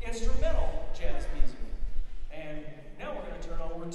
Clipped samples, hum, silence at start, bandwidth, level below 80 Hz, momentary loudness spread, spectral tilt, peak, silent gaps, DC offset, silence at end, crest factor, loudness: under 0.1%; none; 0 s; 8.4 kHz; -32 dBFS; 11 LU; -5.5 dB/octave; -10 dBFS; none; under 0.1%; 0 s; 16 dB; -38 LUFS